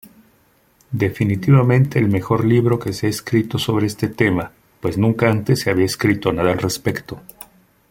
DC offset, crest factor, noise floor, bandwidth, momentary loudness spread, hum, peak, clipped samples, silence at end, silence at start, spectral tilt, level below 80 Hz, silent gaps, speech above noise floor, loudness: under 0.1%; 18 dB; -57 dBFS; 17 kHz; 10 LU; none; -2 dBFS; under 0.1%; 0.5 s; 0.9 s; -6.5 dB/octave; -48 dBFS; none; 40 dB; -18 LUFS